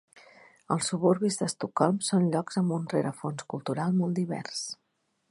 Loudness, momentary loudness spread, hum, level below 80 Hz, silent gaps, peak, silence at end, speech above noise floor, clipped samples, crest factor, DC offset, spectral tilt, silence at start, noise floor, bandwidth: -29 LUFS; 10 LU; none; -74 dBFS; none; -8 dBFS; 0.55 s; 48 dB; under 0.1%; 20 dB; under 0.1%; -5.5 dB/octave; 0.7 s; -76 dBFS; 11.5 kHz